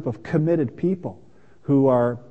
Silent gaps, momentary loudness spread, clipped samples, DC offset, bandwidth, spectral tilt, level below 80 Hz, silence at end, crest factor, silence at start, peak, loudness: none; 14 LU; under 0.1%; 0.4%; 7.2 kHz; -10.5 dB/octave; -58 dBFS; 0.1 s; 16 dB; 0 s; -6 dBFS; -22 LUFS